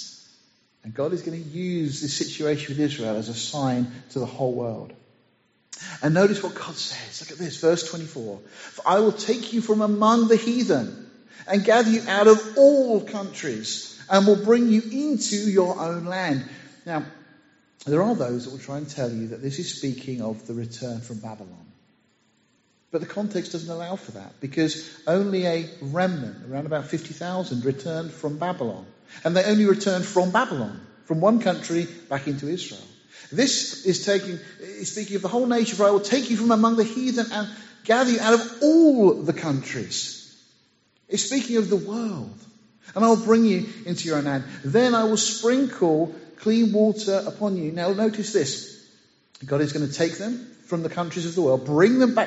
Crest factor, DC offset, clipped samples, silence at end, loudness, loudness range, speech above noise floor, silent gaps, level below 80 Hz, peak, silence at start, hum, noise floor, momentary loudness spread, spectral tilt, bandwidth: 22 dB; under 0.1%; under 0.1%; 0 s; -23 LUFS; 9 LU; 42 dB; none; -68 dBFS; -2 dBFS; 0 s; none; -65 dBFS; 15 LU; -5 dB/octave; 8 kHz